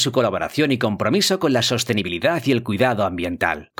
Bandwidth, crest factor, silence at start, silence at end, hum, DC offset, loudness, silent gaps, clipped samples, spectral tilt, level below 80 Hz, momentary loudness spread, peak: 19 kHz; 18 dB; 0 s; 0.15 s; none; under 0.1%; -20 LUFS; none; under 0.1%; -4.5 dB/octave; -52 dBFS; 4 LU; -2 dBFS